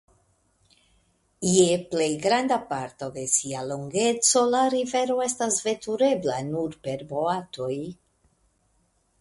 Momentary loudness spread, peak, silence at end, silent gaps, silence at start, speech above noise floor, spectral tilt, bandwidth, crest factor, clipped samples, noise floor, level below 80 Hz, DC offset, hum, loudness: 12 LU; -6 dBFS; 1.25 s; none; 1.4 s; 43 dB; -3.5 dB/octave; 11.5 kHz; 20 dB; under 0.1%; -68 dBFS; -64 dBFS; under 0.1%; none; -24 LUFS